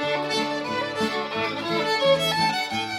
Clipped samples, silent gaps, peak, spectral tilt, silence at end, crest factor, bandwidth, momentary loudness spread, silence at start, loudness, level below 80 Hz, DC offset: under 0.1%; none; -10 dBFS; -3.5 dB/octave; 0 s; 16 dB; 16 kHz; 6 LU; 0 s; -24 LUFS; -62 dBFS; under 0.1%